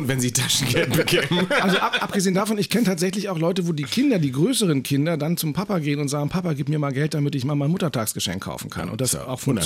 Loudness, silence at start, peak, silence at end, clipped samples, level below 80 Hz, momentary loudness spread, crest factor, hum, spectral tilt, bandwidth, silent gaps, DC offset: -22 LUFS; 0 s; -8 dBFS; 0 s; under 0.1%; -54 dBFS; 5 LU; 14 dB; none; -4.5 dB/octave; 17 kHz; none; under 0.1%